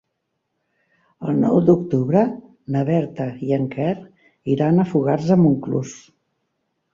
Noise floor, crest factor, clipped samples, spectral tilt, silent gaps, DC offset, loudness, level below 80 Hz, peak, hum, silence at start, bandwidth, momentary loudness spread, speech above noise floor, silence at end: -75 dBFS; 18 dB; under 0.1%; -9 dB/octave; none; under 0.1%; -19 LUFS; -58 dBFS; -2 dBFS; none; 1.2 s; 7.4 kHz; 12 LU; 57 dB; 0.95 s